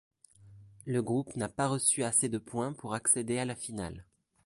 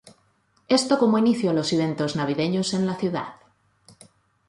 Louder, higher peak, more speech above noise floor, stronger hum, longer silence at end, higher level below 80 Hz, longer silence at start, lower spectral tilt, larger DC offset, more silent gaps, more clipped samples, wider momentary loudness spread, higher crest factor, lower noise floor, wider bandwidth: second, -31 LUFS vs -23 LUFS; second, -12 dBFS vs -6 dBFS; second, 24 dB vs 42 dB; neither; second, 0.45 s vs 1.15 s; about the same, -62 dBFS vs -64 dBFS; first, 0.4 s vs 0.05 s; second, -4 dB/octave vs -5.5 dB/octave; neither; neither; neither; first, 13 LU vs 8 LU; about the same, 20 dB vs 18 dB; second, -56 dBFS vs -65 dBFS; about the same, 12 kHz vs 11.5 kHz